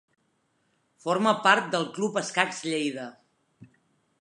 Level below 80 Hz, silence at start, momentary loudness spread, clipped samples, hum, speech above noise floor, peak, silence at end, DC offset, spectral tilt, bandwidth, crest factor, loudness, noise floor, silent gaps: -82 dBFS; 1.05 s; 14 LU; under 0.1%; none; 46 dB; -4 dBFS; 0.55 s; under 0.1%; -3.5 dB/octave; 11.5 kHz; 24 dB; -25 LUFS; -72 dBFS; none